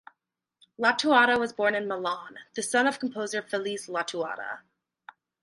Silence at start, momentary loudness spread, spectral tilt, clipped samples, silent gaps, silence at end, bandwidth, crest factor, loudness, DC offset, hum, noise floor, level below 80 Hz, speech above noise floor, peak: 0.8 s; 15 LU; -2.5 dB/octave; under 0.1%; none; 0.85 s; 11.5 kHz; 22 dB; -27 LUFS; under 0.1%; none; -81 dBFS; -74 dBFS; 54 dB; -6 dBFS